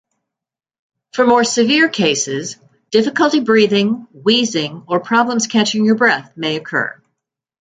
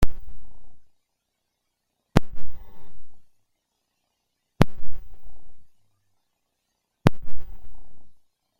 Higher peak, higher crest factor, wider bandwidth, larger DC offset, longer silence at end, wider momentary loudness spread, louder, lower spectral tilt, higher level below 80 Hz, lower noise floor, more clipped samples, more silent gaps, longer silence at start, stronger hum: about the same, 0 dBFS vs 0 dBFS; about the same, 16 dB vs 20 dB; second, 9.4 kHz vs 16.5 kHz; neither; first, 0.7 s vs 0.45 s; second, 9 LU vs 24 LU; first, -15 LUFS vs -26 LUFS; second, -3.5 dB/octave vs -7 dB/octave; second, -62 dBFS vs -38 dBFS; first, -86 dBFS vs -78 dBFS; neither; neither; first, 1.15 s vs 0 s; neither